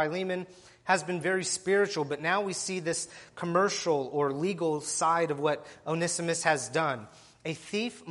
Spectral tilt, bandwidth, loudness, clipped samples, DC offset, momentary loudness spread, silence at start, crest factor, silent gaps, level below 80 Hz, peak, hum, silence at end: -3.5 dB/octave; 11.5 kHz; -30 LUFS; under 0.1%; under 0.1%; 10 LU; 0 s; 20 dB; none; -72 dBFS; -10 dBFS; none; 0 s